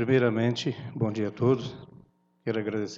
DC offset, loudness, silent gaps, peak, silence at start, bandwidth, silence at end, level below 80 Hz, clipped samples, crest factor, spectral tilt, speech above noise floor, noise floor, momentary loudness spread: under 0.1%; -28 LUFS; none; -12 dBFS; 0 s; 7.6 kHz; 0 s; -66 dBFS; under 0.1%; 16 dB; -7 dB/octave; 31 dB; -58 dBFS; 13 LU